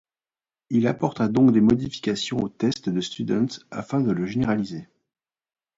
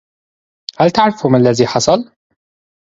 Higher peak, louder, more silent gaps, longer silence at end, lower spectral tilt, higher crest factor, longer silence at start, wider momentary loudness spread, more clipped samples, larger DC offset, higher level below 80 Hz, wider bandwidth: second, -6 dBFS vs 0 dBFS; second, -23 LUFS vs -13 LUFS; neither; about the same, 0.95 s vs 0.85 s; about the same, -6.5 dB/octave vs -5.5 dB/octave; about the same, 18 dB vs 16 dB; about the same, 0.7 s vs 0.8 s; second, 9 LU vs 19 LU; neither; neither; second, -56 dBFS vs -50 dBFS; about the same, 7.8 kHz vs 8 kHz